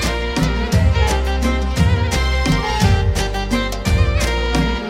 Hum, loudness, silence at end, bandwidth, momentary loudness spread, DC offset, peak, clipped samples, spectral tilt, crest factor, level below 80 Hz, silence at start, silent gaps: none; -18 LUFS; 0 s; 15.5 kHz; 4 LU; under 0.1%; -2 dBFS; under 0.1%; -5.5 dB/octave; 14 dB; -20 dBFS; 0 s; none